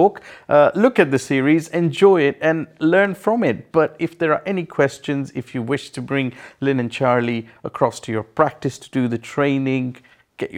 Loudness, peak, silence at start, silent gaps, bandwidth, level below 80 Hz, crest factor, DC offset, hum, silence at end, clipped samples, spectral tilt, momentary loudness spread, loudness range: -19 LUFS; 0 dBFS; 0 s; none; 14 kHz; -62 dBFS; 18 dB; under 0.1%; none; 0 s; under 0.1%; -6.5 dB/octave; 11 LU; 6 LU